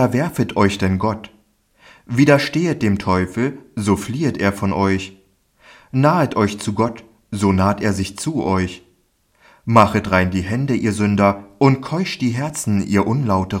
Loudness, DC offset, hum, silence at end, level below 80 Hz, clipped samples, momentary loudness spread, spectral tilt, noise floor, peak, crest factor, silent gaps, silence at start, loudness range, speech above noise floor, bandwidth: -18 LUFS; under 0.1%; none; 0 s; -50 dBFS; under 0.1%; 8 LU; -6.5 dB/octave; -61 dBFS; 0 dBFS; 18 dB; none; 0 s; 3 LU; 43 dB; 16 kHz